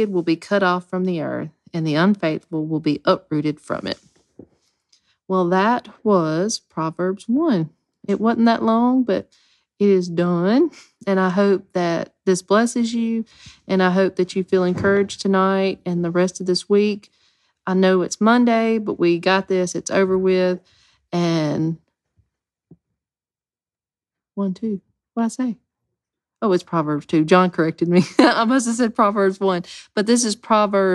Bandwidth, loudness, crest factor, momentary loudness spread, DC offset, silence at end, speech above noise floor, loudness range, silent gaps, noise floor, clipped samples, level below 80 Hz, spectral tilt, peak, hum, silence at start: 12 kHz; -19 LUFS; 18 dB; 10 LU; under 0.1%; 0 s; over 71 dB; 9 LU; none; under -90 dBFS; under 0.1%; -62 dBFS; -5.5 dB/octave; 0 dBFS; none; 0 s